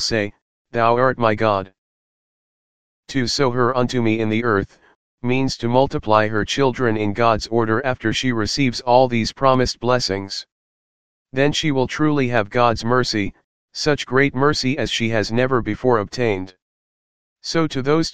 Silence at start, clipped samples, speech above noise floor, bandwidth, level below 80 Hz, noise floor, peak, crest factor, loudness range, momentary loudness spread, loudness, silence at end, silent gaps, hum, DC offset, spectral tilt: 0 s; under 0.1%; over 71 dB; 9.8 kHz; -44 dBFS; under -90 dBFS; 0 dBFS; 20 dB; 3 LU; 7 LU; -19 LUFS; 0 s; 0.42-0.65 s, 1.78-3.03 s, 4.95-5.18 s, 10.52-11.25 s, 13.44-13.68 s, 16.62-17.36 s; none; 2%; -5 dB/octave